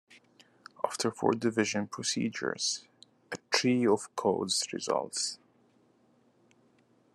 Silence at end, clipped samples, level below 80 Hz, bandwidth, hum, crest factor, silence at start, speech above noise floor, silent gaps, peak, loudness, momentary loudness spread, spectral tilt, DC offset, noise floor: 1.8 s; under 0.1%; -82 dBFS; 12.5 kHz; none; 22 dB; 0.1 s; 36 dB; none; -10 dBFS; -30 LUFS; 9 LU; -3 dB/octave; under 0.1%; -67 dBFS